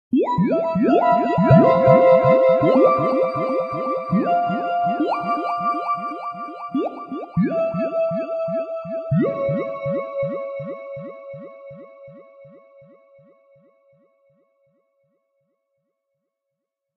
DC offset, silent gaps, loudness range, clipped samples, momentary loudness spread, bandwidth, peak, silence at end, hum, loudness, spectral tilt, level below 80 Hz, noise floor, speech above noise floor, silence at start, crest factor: under 0.1%; none; 16 LU; under 0.1%; 18 LU; 5.2 kHz; 0 dBFS; 4.5 s; none; -19 LUFS; -10 dB/octave; -56 dBFS; -82 dBFS; 67 dB; 0.1 s; 20 dB